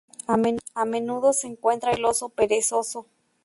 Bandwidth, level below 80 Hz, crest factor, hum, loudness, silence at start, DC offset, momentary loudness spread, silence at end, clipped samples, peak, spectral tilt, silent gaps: 12 kHz; -60 dBFS; 16 dB; none; -24 LUFS; 0.3 s; under 0.1%; 5 LU; 0.4 s; under 0.1%; -8 dBFS; -3.5 dB/octave; none